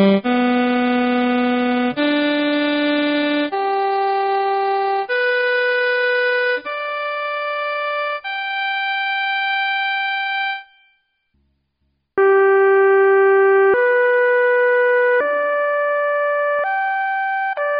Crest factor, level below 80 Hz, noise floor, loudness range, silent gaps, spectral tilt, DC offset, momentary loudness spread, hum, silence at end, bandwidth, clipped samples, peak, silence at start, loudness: 14 dB; -64 dBFS; -69 dBFS; 6 LU; none; -2 dB/octave; under 0.1%; 9 LU; none; 0 s; 5.2 kHz; under 0.1%; -4 dBFS; 0 s; -17 LUFS